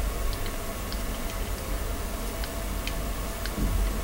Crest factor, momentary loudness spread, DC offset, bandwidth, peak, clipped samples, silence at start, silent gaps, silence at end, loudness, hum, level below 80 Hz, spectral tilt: 16 dB; 4 LU; under 0.1%; 17 kHz; -14 dBFS; under 0.1%; 0 s; none; 0 s; -32 LUFS; none; -32 dBFS; -4.5 dB/octave